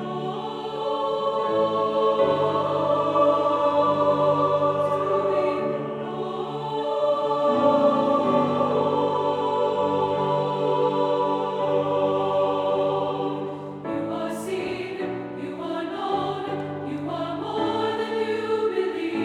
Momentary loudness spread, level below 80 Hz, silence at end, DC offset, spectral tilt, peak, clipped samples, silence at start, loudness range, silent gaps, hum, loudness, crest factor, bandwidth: 9 LU; -64 dBFS; 0 s; under 0.1%; -7 dB/octave; -8 dBFS; under 0.1%; 0 s; 7 LU; none; none; -24 LUFS; 16 dB; 11.5 kHz